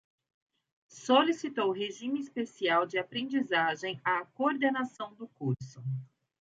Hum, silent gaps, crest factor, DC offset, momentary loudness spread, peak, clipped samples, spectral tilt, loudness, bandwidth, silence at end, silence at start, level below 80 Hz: none; none; 20 dB; under 0.1%; 12 LU; -12 dBFS; under 0.1%; -5.5 dB/octave; -31 LUFS; 7.8 kHz; 0.5 s; 0.95 s; -76 dBFS